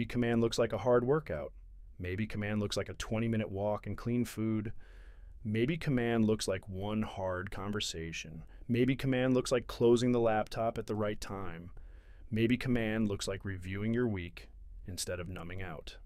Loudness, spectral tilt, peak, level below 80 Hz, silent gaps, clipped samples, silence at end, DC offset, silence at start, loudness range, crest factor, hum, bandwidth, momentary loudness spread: -34 LUFS; -6 dB/octave; -16 dBFS; -50 dBFS; none; under 0.1%; 0 s; under 0.1%; 0 s; 4 LU; 16 dB; none; 15.5 kHz; 14 LU